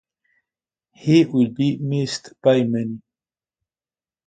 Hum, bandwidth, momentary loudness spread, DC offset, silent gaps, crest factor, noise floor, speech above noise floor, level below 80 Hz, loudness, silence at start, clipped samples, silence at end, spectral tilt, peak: none; 9.2 kHz; 12 LU; under 0.1%; none; 20 dB; under -90 dBFS; over 71 dB; -64 dBFS; -20 LUFS; 1.05 s; under 0.1%; 1.3 s; -7 dB/octave; -2 dBFS